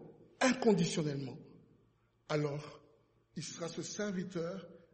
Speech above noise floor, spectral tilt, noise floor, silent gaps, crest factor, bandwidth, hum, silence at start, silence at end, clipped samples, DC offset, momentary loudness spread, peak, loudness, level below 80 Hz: 36 dB; -5 dB/octave; -72 dBFS; none; 22 dB; 8.4 kHz; none; 0 s; 0.15 s; under 0.1%; under 0.1%; 17 LU; -16 dBFS; -36 LUFS; -74 dBFS